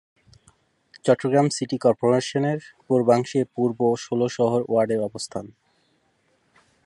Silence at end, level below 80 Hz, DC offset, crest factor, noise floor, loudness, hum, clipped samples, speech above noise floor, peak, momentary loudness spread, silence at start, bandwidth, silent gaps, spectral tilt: 1.35 s; -64 dBFS; under 0.1%; 18 dB; -66 dBFS; -23 LUFS; none; under 0.1%; 45 dB; -4 dBFS; 9 LU; 0.95 s; 11.5 kHz; none; -6 dB/octave